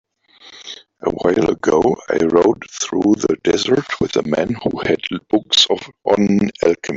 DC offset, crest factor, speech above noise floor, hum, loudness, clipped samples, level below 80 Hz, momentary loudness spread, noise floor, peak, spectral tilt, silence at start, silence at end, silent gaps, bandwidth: under 0.1%; 16 dB; 30 dB; none; -17 LUFS; under 0.1%; -48 dBFS; 9 LU; -46 dBFS; 0 dBFS; -4.5 dB/octave; 0.45 s; 0 s; none; 8 kHz